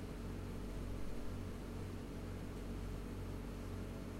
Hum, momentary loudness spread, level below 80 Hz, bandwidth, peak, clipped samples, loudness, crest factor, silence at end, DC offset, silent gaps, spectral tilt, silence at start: none; 1 LU; -50 dBFS; 16 kHz; -32 dBFS; under 0.1%; -47 LUFS; 14 dB; 0 s; under 0.1%; none; -6.5 dB/octave; 0 s